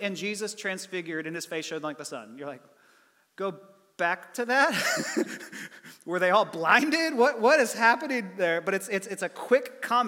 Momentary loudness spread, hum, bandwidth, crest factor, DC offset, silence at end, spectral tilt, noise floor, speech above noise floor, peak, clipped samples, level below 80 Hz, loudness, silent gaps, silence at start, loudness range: 17 LU; none; 17.5 kHz; 22 dB; under 0.1%; 0 s; -3 dB/octave; -63 dBFS; 36 dB; -6 dBFS; under 0.1%; -88 dBFS; -26 LUFS; none; 0 s; 11 LU